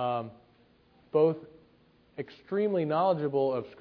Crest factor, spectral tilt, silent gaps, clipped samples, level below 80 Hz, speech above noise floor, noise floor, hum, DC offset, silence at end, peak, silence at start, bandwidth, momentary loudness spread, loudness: 18 dB; -10 dB/octave; none; under 0.1%; -72 dBFS; 34 dB; -63 dBFS; none; under 0.1%; 0.05 s; -14 dBFS; 0 s; 5.4 kHz; 16 LU; -29 LUFS